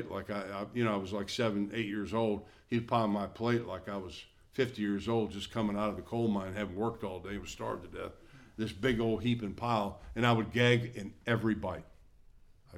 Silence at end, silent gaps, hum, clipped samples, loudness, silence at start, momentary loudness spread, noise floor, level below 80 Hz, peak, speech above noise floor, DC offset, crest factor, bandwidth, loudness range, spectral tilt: 0 s; none; none; under 0.1%; -34 LUFS; 0 s; 11 LU; -58 dBFS; -58 dBFS; -14 dBFS; 25 dB; under 0.1%; 20 dB; 14 kHz; 4 LU; -6.5 dB/octave